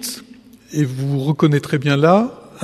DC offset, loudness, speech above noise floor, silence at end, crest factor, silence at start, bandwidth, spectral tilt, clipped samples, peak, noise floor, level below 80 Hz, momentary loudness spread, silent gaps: under 0.1%; -17 LUFS; 27 dB; 0 s; 18 dB; 0 s; 13.5 kHz; -6.5 dB/octave; under 0.1%; 0 dBFS; -43 dBFS; -58 dBFS; 13 LU; none